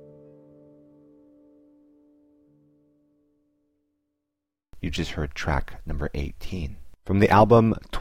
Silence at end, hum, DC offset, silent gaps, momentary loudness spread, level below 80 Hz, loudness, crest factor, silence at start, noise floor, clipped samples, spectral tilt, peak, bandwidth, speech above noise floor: 0 s; none; under 0.1%; none; 19 LU; -38 dBFS; -23 LUFS; 22 dB; 0 s; -85 dBFS; under 0.1%; -7 dB/octave; -6 dBFS; 15.5 kHz; 63 dB